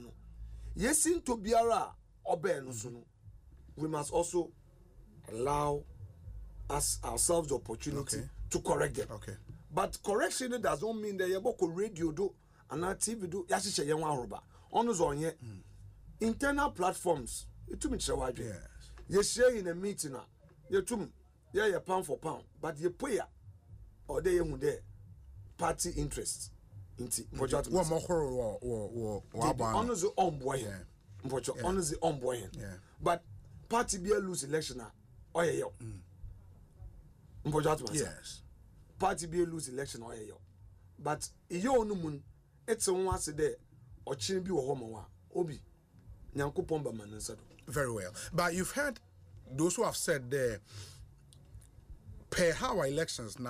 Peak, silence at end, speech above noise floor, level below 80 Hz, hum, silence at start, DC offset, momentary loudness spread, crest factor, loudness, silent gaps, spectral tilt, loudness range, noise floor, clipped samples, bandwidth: -18 dBFS; 0 s; 24 dB; -52 dBFS; none; 0 s; under 0.1%; 18 LU; 18 dB; -34 LUFS; none; -4 dB/octave; 4 LU; -58 dBFS; under 0.1%; 15.5 kHz